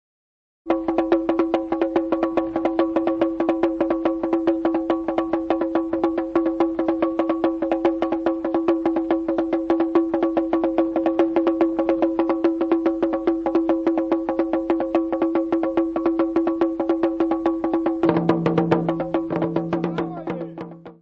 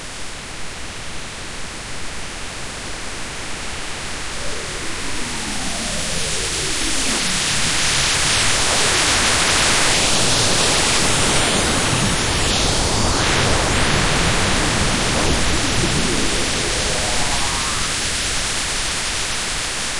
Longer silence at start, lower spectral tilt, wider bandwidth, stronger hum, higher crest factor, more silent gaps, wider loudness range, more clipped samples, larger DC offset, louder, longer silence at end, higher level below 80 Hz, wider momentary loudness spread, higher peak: first, 0.65 s vs 0 s; first, -9 dB/octave vs -2 dB/octave; second, 5.4 kHz vs 11.5 kHz; neither; about the same, 18 dB vs 16 dB; neither; second, 1 LU vs 13 LU; neither; neither; second, -22 LUFS vs -17 LUFS; about the same, 0.1 s vs 0 s; second, -52 dBFS vs -30 dBFS; second, 3 LU vs 14 LU; about the same, -2 dBFS vs -2 dBFS